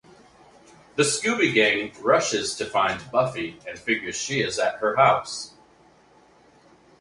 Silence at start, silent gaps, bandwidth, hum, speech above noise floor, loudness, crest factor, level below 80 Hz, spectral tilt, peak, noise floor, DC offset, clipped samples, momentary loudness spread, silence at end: 0.95 s; none; 11.5 kHz; none; 33 dB; -23 LUFS; 22 dB; -62 dBFS; -3 dB/octave; -4 dBFS; -56 dBFS; under 0.1%; under 0.1%; 14 LU; 1.5 s